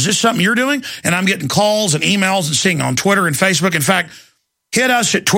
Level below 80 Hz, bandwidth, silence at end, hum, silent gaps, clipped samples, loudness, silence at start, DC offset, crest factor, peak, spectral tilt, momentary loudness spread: -56 dBFS; 16.5 kHz; 0 s; none; none; under 0.1%; -14 LUFS; 0 s; under 0.1%; 14 dB; 0 dBFS; -3.5 dB/octave; 4 LU